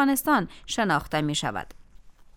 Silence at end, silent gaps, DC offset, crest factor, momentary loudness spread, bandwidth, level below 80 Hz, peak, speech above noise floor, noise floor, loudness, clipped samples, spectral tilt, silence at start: 0.25 s; none; under 0.1%; 16 dB; 11 LU; 19 kHz; -50 dBFS; -10 dBFS; 24 dB; -49 dBFS; -25 LUFS; under 0.1%; -4 dB/octave; 0 s